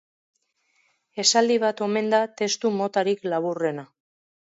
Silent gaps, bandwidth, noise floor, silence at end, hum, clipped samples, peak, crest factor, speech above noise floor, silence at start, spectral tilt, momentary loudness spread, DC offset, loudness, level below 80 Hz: none; 8 kHz; -69 dBFS; 0.75 s; none; under 0.1%; -4 dBFS; 22 dB; 46 dB; 1.15 s; -3 dB/octave; 9 LU; under 0.1%; -23 LUFS; -78 dBFS